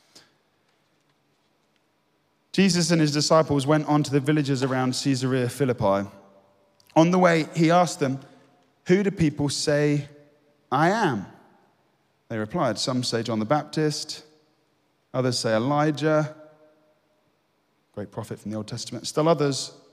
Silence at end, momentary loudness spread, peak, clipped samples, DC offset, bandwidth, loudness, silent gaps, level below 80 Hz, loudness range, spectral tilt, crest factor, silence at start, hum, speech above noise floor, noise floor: 0.2 s; 14 LU; -4 dBFS; under 0.1%; under 0.1%; 15 kHz; -23 LUFS; none; -60 dBFS; 5 LU; -5.5 dB/octave; 20 dB; 2.55 s; 50 Hz at -50 dBFS; 46 dB; -69 dBFS